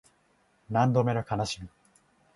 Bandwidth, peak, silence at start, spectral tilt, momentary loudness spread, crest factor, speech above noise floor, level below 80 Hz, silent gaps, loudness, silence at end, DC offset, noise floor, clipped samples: 11.5 kHz; -10 dBFS; 0.7 s; -6.5 dB/octave; 13 LU; 20 dB; 41 dB; -58 dBFS; none; -28 LUFS; 0.7 s; under 0.1%; -67 dBFS; under 0.1%